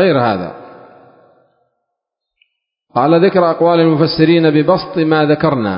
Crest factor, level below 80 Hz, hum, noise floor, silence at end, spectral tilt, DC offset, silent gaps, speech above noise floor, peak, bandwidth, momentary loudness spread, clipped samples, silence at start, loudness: 14 dB; -50 dBFS; none; -77 dBFS; 0 s; -11.5 dB/octave; under 0.1%; none; 66 dB; 0 dBFS; 5.4 kHz; 6 LU; under 0.1%; 0 s; -12 LUFS